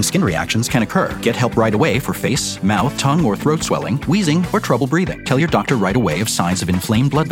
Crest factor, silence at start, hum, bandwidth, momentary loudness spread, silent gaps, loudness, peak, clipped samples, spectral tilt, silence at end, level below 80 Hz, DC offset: 14 dB; 0 s; none; 17 kHz; 3 LU; none; -17 LUFS; -2 dBFS; under 0.1%; -5 dB/octave; 0 s; -40 dBFS; under 0.1%